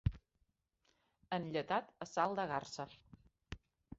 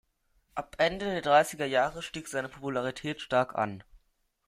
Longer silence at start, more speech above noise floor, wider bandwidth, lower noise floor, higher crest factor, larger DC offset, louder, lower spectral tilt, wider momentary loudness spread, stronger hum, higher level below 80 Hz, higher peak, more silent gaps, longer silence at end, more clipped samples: second, 0.05 s vs 0.55 s; about the same, 42 dB vs 43 dB; second, 7.6 kHz vs 15.5 kHz; first, -81 dBFS vs -73 dBFS; about the same, 22 dB vs 20 dB; neither; second, -40 LUFS vs -30 LUFS; about the same, -4.5 dB/octave vs -4 dB/octave; first, 18 LU vs 15 LU; neither; about the same, -56 dBFS vs -60 dBFS; second, -20 dBFS vs -10 dBFS; neither; about the same, 0.4 s vs 0.5 s; neither